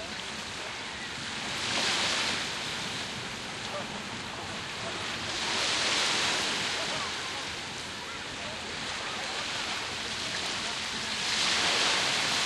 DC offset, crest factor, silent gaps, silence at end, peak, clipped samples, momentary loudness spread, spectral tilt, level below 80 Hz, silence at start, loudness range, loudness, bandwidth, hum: under 0.1%; 18 dB; none; 0 s; -14 dBFS; under 0.1%; 10 LU; -1 dB/octave; -60 dBFS; 0 s; 5 LU; -30 LUFS; 13.5 kHz; none